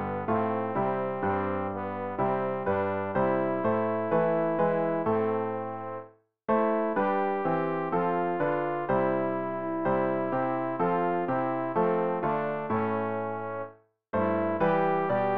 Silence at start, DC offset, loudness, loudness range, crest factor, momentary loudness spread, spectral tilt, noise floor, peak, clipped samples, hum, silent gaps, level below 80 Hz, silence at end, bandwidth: 0 s; 0.3%; -28 LUFS; 2 LU; 14 dB; 7 LU; -6.5 dB/octave; -49 dBFS; -14 dBFS; under 0.1%; none; none; -64 dBFS; 0 s; 5 kHz